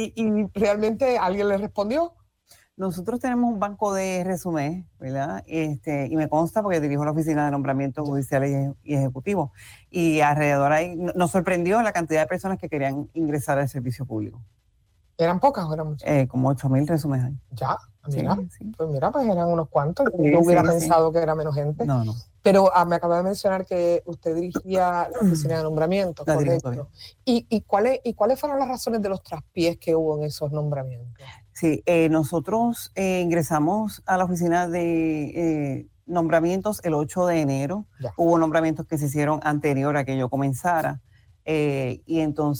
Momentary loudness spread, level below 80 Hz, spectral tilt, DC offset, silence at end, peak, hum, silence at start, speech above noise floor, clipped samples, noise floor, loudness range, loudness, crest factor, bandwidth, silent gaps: 9 LU; -52 dBFS; -7 dB/octave; under 0.1%; 0 s; -6 dBFS; none; 0 s; 40 dB; under 0.1%; -63 dBFS; 5 LU; -23 LUFS; 18 dB; over 20 kHz; none